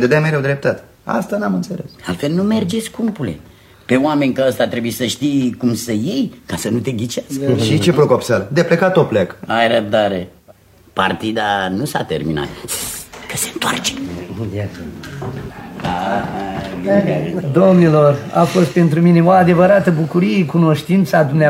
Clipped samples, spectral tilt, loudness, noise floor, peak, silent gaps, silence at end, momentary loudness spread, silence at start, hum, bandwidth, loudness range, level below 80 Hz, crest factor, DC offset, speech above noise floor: under 0.1%; -6 dB/octave; -16 LUFS; -46 dBFS; 0 dBFS; none; 0 s; 14 LU; 0 s; none; 16.5 kHz; 9 LU; -48 dBFS; 16 dB; under 0.1%; 31 dB